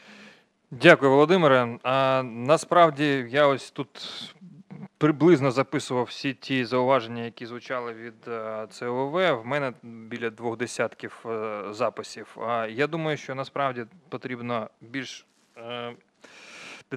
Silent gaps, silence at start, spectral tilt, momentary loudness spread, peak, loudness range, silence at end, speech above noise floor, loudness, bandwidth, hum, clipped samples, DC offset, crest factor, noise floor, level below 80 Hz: none; 0.1 s; -5.5 dB/octave; 20 LU; 0 dBFS; 10 LU; 0 s; 28 dB; -24 LUFS; 12.5 kHz; none; under 0.1%; under 0.1%; 26 dB; -53 dBFS; -76 dBFS